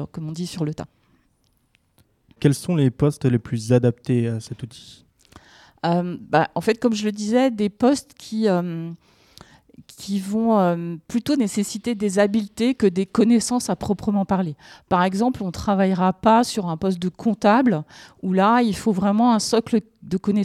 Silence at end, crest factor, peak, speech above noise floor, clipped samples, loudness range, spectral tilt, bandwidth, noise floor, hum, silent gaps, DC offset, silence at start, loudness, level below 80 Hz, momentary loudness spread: 0 s; 18 dB; -4 dBFS; 44 dB; under 0.1%; 4 LU; -6 dB/octave; 13.5 kHz; -65 dBFS; none; none; under 0.1%; 0 s; -21 LUFS; -52 dBFS; 12 LU